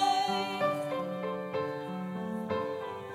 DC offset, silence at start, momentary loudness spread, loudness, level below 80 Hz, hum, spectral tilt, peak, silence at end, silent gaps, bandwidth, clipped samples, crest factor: under 0.1%; 0 s; 7 LU; -33 LUFS; -74 dBFS; none; -5 dB/octave; -16 dBFS; 0 s; none; 16 kHz; under 0.1%; 16 dB